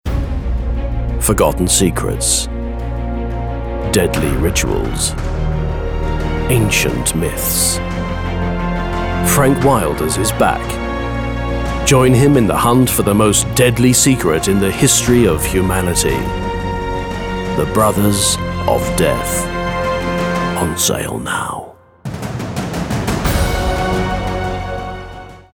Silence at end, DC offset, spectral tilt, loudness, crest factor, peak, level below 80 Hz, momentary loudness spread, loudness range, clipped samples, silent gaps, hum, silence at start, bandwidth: 0.1 s; under 0.1%; -4.5 dB/octave; -15 LUFS; 14 dB; 0 dBFS; -24 dBFS; 10 LU; 7 LU; under 0.1%; none; none; 0.05 s; over 20 kHz